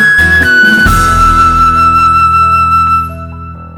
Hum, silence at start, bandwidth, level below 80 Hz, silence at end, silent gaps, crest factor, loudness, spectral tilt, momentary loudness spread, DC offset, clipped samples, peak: none; 0 s; 19.5 kHz; -20 dBFS; 0 s; none; 8 dB; -6 LUFS; -4 dB/octave; 12 LU; under 0.1%; 0.2%; 0 dBFS